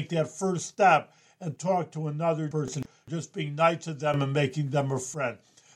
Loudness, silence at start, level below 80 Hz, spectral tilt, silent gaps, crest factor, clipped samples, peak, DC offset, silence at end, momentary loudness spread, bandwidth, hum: -28 LUFS; 0 s; -68 dBFS; -5.5 dB/octave; none; 20 dB; under 0.1%; -8 dBFS; under 0.1%; 0.4 s; 13 LU; 12 kHz; none